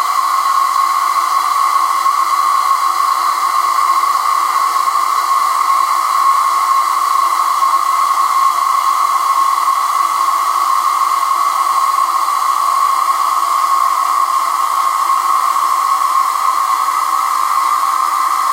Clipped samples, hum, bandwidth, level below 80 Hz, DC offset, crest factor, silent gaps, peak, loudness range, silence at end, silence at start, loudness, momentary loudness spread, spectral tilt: under 0.1%; none; 16 kHz; under -90 dBFS; under 0.1%; 12 dB; none; -2 dBFS; 1 LU; 0 s; 0 s; -13 LUFS; 1 LU; 3 dB/octave